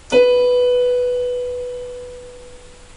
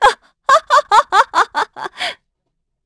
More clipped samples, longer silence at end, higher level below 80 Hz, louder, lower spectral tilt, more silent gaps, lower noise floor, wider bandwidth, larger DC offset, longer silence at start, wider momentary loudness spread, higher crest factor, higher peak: neither; second, 0 s vs 0.7 s; about the same, -44 dBFS vs -48 dBFS; about the same, -17 LUFS vs -15 LUFS; first, -3.5 dB/octave vs -0.5 dB/octave; neither; second, -40 dBFS vs -72 dBFS; about the same, 10.5 kHz vs 11 kHz; neither; about the same, 0.1 s vs 0 s; first, 21 LU vs 12 LU; about the same, 16 dB vs 16 dB; second, -4 dBFS vs 0 dBFS